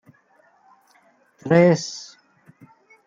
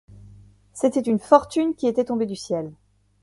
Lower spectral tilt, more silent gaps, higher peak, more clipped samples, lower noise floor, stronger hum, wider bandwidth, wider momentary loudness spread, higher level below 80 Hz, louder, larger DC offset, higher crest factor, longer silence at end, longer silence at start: about the same, -6 dB/octave vs -6 dB/octave; neither; about the same, -4 dBFS vs -2 dBFS; neither; first, -59 dBFS vs -49 dBFS; second, none vs 50 Hz at -50 dBFS; second, 7.6 kHz vs 11.5 kHz; first, 23 LU vs 11 LU; second, -68 dBFS vs -56 dBFS; first, -18 LUFS vs -22 LUFS; neither; about the same, 20 dB vs 22 dB; first, 1.05 s vs 0.5 s; first, 1.45 s vs 0.75 s